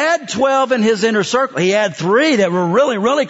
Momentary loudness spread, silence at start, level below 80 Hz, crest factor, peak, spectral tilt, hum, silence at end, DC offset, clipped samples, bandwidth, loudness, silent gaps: 3 LU; 0 s; -60 dBFS; 12 dB; -2 dBFS; -4.5 dB/octave; none; 0 s; under 0.1%; under 0.1%; 8 kHz; -15 LUFS; none